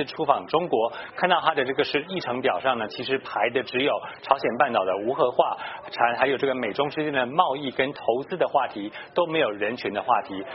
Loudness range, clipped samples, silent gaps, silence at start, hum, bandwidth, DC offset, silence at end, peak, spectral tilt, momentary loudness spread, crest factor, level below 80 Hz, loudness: 1 LU; under 0.1%; none; 0 s; none; 5.8 kHz; under 0.1%; 0 s; -4 dBFS; -2 dB/octave; 6 LU; 22 dB; -66 dBFS; -25 LUFS